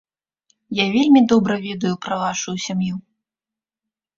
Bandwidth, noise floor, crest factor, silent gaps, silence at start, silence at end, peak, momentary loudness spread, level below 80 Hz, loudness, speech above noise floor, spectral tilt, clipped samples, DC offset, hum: 7.6 kHz; -89 dBFS; 18 dB; none; 0.7 s; 1.15 s; -2 dBFS; 12 LU; -60 dBFS; -19 LUFS; 71 dB; -5 dB/octave; under 0.1%; under 0.1%; none